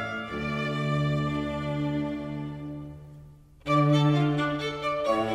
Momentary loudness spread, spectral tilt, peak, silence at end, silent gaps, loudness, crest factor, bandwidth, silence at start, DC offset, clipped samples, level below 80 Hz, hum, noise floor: 17 LU; -7 dB/octave; -12 dBFS; 0 s; none; -27 LUFS; 16 dB; 9.8 kHz; 0 s; under 0.1%; under 0.1%; -50 dBFS; none; -50 dBFS